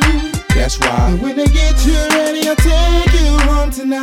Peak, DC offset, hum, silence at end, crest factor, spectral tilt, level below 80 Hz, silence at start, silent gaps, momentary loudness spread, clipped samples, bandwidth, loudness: 0 dBFS; under 0.1%; none; 0 s; 10 dB; -5 dB/octave; -14 dBFS; 0 s; none; 3 LU; under 0.1%; 15.5 kHz; -14 LUFS